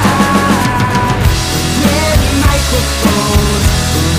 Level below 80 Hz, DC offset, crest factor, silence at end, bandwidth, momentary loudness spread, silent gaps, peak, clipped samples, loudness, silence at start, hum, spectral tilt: -18 dBFS; under 0.1%; 10 dB; 0 s; 16 kHz; 2 LU; none; 0 dBFS; under 0.1%; -11 LUFS; 0 s; none; -4.5 dB/octave